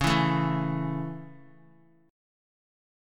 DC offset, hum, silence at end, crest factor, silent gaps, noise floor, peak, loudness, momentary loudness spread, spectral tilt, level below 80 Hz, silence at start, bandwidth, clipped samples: under 0.1%; none; 1 s; 20 dB; none; -59 dBFS; -10 dBFS; -28 LUFS; 18 LU; -6 dB/octave; -50 dBFS; 0 s; 14.5 kHz; under 0.1%